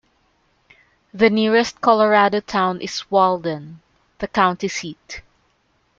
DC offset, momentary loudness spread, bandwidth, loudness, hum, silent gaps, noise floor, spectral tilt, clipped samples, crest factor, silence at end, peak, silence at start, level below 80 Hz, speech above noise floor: under 0.1%; 17 LU; 7.6 kHz; -18 LUFS; none; none; -64 dBFS; -4.5 dB/octave; under 0.1%; 18 dB; 0.8 s; -2 dBFS; 1.15 s; -56 dBFS; 45 dB